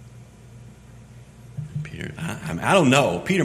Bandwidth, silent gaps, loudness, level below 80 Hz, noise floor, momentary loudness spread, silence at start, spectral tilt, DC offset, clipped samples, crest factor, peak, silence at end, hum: 15 kHz; none; -22 LUFS; -50 dBFS; -45 dBFS; 18 LU; 0 s; -5 dB/octave; under 0.1%; under 0.1%; 24 dB; -2 dBFS; 0 s; none